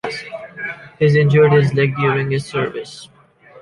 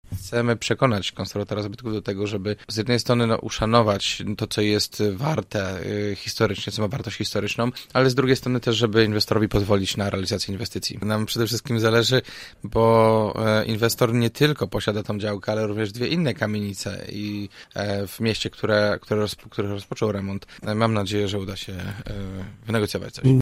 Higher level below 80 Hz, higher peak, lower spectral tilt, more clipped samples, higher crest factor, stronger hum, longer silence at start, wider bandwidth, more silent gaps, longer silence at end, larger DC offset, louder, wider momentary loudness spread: about the same, -52 dBFS vs -48 dBFS; about the same, -2 dBFS vs -2 dBFS; first, -7.5 dB/octave vs -5.5 dB/octave; neither; second, 14 dB vs 20 dB; neither; about the same, 0.05 s vs 0.1 s; second, 11 kHz vs 16 kHz; neither; about the same, 0 s vs 0 s; neither; first, -16 LUFS vs -23 LUFS; first, 18 LU vs 10 LU